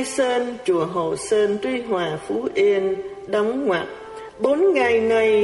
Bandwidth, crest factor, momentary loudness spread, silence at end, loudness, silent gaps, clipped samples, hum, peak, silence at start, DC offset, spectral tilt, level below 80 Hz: 11.5 kHz; 14 dB; 8 LU; 0 s; -21 LUFS; none; under 0.1%; none; -6 dBFS; 0 s; under 0.1%; -4.5 dB/octave; -58 dBFS